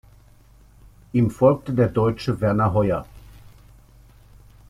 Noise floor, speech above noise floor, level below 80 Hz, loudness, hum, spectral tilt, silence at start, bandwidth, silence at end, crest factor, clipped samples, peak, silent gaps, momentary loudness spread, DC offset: -51 dBFS; 31 dB; -46 dBFS; -21 LUFS; 50 Hz at -45 dBFS; -8.5 dB/octave; 1.15 s; 14 kHz; 1.5 s; 18 dB; under 0.1%; -4 dBFS; none; 6 LU; under 0.1%